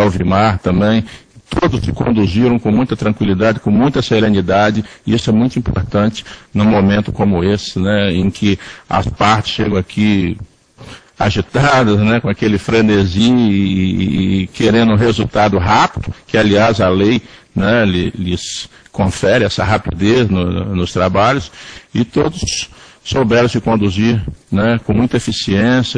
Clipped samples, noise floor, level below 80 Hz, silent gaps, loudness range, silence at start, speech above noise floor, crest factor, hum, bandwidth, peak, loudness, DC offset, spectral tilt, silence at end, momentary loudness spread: under 0.1%; -37 dBFS; -34 dBFS; none; 3 LU; 0 s; 24 dB; 14 dB; none; 10.5 kHz; 0 dBFS; -14 LUFS; under 0.1%; -6 dB/octave; 0 s; 8 LU